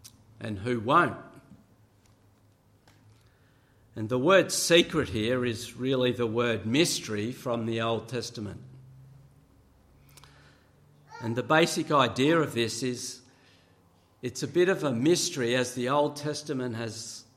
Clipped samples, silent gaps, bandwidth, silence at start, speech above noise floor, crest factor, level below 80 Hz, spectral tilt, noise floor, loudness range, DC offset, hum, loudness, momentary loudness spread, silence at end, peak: under 0.1%; none; 15.5 kHz; 0.05 s; 35 dB; 22 dB; -64 dBFS; -4 dB/octave; -62 dBFS; 10 LU; under 0.1%; none; -27 LUFS; 16 LU; 0.15 s; -8 dBFS